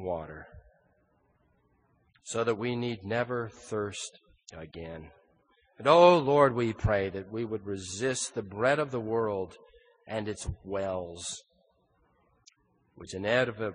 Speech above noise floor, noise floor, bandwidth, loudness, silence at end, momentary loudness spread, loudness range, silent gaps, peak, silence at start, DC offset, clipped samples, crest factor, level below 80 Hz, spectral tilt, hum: 41 dB; -70 dBFS; 10 kHz; -29 LUFS; 0 s; 20 LU; 11 LU; none; -6 dBFS; 0 s; under 0.1%; under 0.1%; 24 dB; -52 dBFS; -5 dB/octave; none